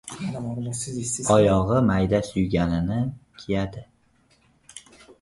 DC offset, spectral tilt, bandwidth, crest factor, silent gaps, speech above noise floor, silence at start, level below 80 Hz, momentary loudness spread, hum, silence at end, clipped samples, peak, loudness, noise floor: under 0.1%; -6 dB/octave; 11.5 kHz; 20 dB; none; 39 dB; 0.05 s; -42 dBFS; 24 LU; none; 0.1 s; under 0.1%; -4 dBFS; -24 LUFS; -62 dBFS